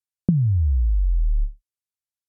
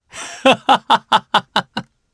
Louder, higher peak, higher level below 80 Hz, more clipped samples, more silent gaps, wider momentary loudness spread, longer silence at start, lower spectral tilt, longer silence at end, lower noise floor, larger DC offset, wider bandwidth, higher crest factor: second, -23 LUFS vs -15 LUFS; second, -6 dBFS vs 0 dBFS; first, -22 dBFS vs -58 dBFS; neither; neither; second, 8 LU vs 16 LU; first, 0.3 s vs 0.15 s; first, -18.5 dB/octave vs -3 dB/octave; first, 0.75 s vs 0.3 s; first, under -90 dBFS vs -31 dBFS; neither; second, 0.8 kHz vs 11 kHz; about the same, 16 dB vs 18 dB